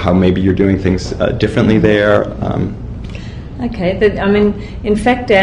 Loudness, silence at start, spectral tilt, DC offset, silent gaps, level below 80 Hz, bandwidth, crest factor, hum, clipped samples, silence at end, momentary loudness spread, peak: -14 LUFS; 0 s; -7.5 dB/octave; under 0.1%; none; -28 dBFS; 11 kHz; 12 dB; none; under 0.1%; 0 s; 16 LU; 0 dBFS